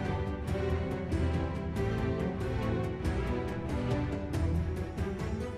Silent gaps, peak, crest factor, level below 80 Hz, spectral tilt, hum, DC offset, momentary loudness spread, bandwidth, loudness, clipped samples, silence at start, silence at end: none; -20 dBFS; 12 dB; -40 dBFS; -7.5 dB/octave; none; under 0.1%; 3 LU; 12.5 kHz; -33 LUFS; under 0.1%; 0 s; 0 s